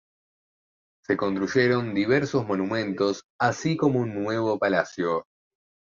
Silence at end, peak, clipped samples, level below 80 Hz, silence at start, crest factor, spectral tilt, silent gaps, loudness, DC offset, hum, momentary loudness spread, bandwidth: 0.65 s; -6 dBFS; under 0.1%; -62 dBFS; 1.1 s; 18 dB; -6 dB/octave; 3.25-3.39 s; -25 LUFS; under 0.1%; none; 5 LU; 7.4 kHz